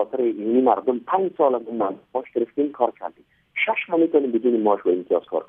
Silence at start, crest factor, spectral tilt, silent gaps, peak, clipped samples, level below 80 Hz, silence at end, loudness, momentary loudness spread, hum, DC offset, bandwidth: 0 s; 18 dB; -9 dB/octave; none; -4 dBFS; under 0.1%; -74 dBFS; 0.05 s; -22 LUFS; 7 LU; none; under 0.1%; 3.7 kHz